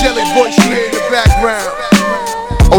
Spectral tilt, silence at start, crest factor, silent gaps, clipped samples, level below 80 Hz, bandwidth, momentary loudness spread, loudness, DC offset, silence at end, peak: -5 dB/octave; 0 s; 10 dB; none; 1%; -18 dBFS; 19.5 kHz; 7 LU; -12 LUFS; under 0.1%; 0 s; 0 dBFS